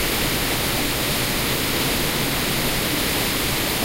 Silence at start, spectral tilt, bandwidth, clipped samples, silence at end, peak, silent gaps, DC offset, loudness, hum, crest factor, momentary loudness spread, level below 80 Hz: 0 s; -3 dB/octave; 16 kHz; under 0.1%; 0 s; -10 dBFS; none; under 0.1%; -20 LUFS; none; 12 dB; 1 LU; -34 dBFS